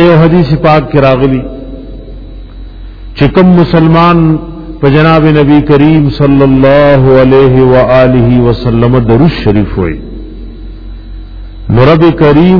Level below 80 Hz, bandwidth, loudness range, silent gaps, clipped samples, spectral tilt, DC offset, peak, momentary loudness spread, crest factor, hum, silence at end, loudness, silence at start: -22 dBFS; 5.4 kHz; 6 LU; none; 7%; -10 dB/octave; under 0.1%; 0 dBFS; 21 LU; 6 dB; none; 0 s; -6 LUFS; 0 s